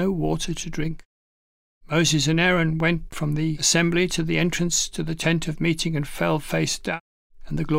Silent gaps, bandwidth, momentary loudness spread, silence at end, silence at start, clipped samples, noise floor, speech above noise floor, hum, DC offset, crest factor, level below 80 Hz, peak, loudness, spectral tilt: 1.05-1.81 s, 7.00-7.30 s; 16 kHz; 10 LU; 0 s; 0 s; under 0.1%; under -90 dBFS; over 67 dB; none; under 0.1%; 16 dB; -40 dBFS; -6 dBFS; -23 LUFS; -4 dB/octave